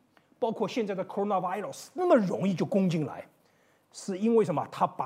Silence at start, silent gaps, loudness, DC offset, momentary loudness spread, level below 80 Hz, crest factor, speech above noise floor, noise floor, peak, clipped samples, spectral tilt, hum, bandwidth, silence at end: 0.4 s; none; -29 LUFS; under 0.1%; 13 LU; -80 dBFS; 18 dB; 38 dB; -66 dBFS; -12 dBFS; under 0.1%; -7 dB/octave; none; 15 kHz; 0 s